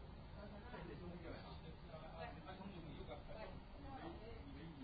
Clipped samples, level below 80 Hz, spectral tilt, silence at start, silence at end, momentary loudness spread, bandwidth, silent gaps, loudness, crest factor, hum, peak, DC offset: under 0.1%; -60 dBFS; -5.5 dB/octave; 0 s; 0 s; 3 LU; 4.8 kHz; none; -55 LUFS; 14 dB; none; -38 dBFS; under 0.1%